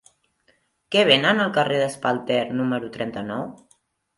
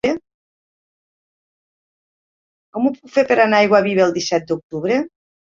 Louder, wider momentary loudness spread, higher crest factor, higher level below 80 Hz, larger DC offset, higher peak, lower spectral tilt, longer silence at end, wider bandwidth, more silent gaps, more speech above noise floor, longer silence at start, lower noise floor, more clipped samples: second, -21 LUFS vs -17 LUFS; about the same, 14 LU vs 12 LU; about the same, 22 dB vs 18 dB; second, -66 dBFS vs -60 dBFS; neither; about the same, -2 dBFS vs -2 dBFS; about the same, -4.5 dB/octave vs -5 dB/octave; first, 0.6 s vs 0.35 s; first, 11.5 kHz vs 7.6 kHz; second, none vs 0.34-2.73 s, 4.63-4.70 s; second, 43 dB vs over 74 dB; first, 0.9 s vs 0.05 s; second, -65 dBFS vs under -90 dBFS; neither